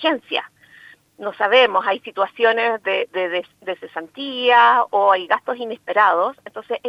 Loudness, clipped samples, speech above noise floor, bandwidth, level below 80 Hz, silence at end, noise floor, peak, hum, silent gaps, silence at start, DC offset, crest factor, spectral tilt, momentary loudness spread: -18 LUFS; under 0.1%; 29 dB; 6.8 kHz; -74 dBFS; 0 s; -47 dBFS; -2 dBFS; none; none; 0 s; under 0.1%; 18 dB; -4 dB/octave; 15 LU